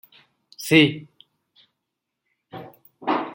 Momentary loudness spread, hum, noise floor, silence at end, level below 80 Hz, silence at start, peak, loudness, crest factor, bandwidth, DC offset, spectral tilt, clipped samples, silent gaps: 25 LU; none; -81 dBFS; 0 s; -66 dBFS; 0.6 s; -2 dBFS; -19 LUFS; 22 dB; 17 kHz; under 0.1%; -5 dB/octave; under 0.1%; none